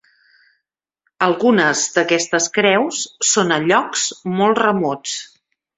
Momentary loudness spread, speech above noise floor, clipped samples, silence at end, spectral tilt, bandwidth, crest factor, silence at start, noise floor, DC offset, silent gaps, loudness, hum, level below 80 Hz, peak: 7 LU; 60 dB; under 0.1%; 0.55 s; -3 dB/octave; 8.4 kHz; 18 dB; 1.2 s; -77 dBFS; under 0.1%; none; -16 LUFS; none; -62 dBFS; 0 dBFS